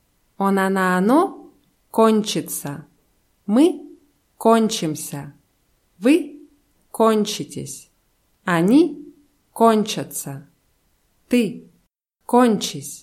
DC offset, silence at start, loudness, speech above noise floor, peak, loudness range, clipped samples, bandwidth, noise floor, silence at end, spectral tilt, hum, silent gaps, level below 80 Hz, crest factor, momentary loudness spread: under 0.1%; 0.4 s; -19 LUFS; 49 dB; -2 dBFS; 3 LU; under 0.1%; 16.5 kHz; -67 dBFS; 0.05 s; -5 dB/octave; none; none; -66 dBFS; 18 dB; 18 LU